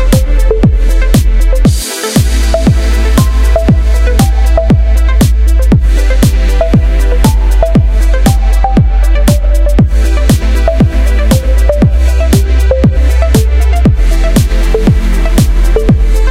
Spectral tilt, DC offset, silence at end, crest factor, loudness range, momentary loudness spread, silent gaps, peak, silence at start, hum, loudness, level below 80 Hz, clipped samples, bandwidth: -6.5 dB/octave; under 0.1%; 0 s; 6 dB; 1 LU; 2 LU; none; 0 dBFS; 0 s; none; -10 LUFS; -8 dBFS; under 0.1%; 15.5 kHz